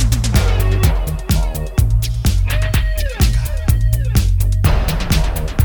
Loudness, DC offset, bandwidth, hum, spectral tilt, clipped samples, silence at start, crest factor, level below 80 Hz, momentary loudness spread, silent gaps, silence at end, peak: -17 LUFS; 0.2%; over 20 kHz; none; -5.5 dB/octave; under 0.1%; 0 s; 14 dB; -16 dBFS; 3 LU; none; 0 s; 0 dBFS